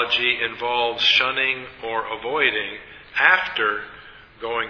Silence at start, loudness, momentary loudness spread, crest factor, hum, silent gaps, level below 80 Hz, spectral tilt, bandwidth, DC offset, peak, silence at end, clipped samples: 0 s; -20 LUFS; 14 LU; 22 dB; none; none; -56 dBFS; -2.5 dB/octave; 5.4 kHz; under 0.1%; 0 dBFS; 0 s; under 0.1%